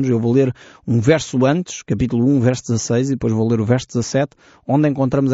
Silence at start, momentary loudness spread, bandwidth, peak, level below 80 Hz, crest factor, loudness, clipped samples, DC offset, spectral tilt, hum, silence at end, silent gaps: 0 s; 6 LU; 8 kHz; -2 dBFS; -46 dBFS; 16 dB; -18 LUFS; under 0.1%; under 0.1%; -7.5 dB/octave; none; 0 s; none